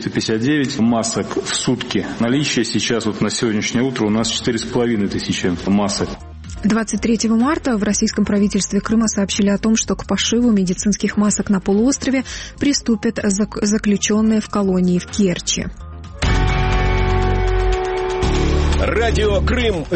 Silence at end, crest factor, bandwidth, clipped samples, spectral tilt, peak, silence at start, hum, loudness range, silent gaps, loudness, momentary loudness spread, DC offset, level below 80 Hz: 0 s; 14 dB; 8.8 kHz; under 0.1%; -4.5 dB/octave; -4 dBFS; 0 s; none; 2 LU; none; -18 LUFS; 4 LU; under 0.1%; -26 dBFS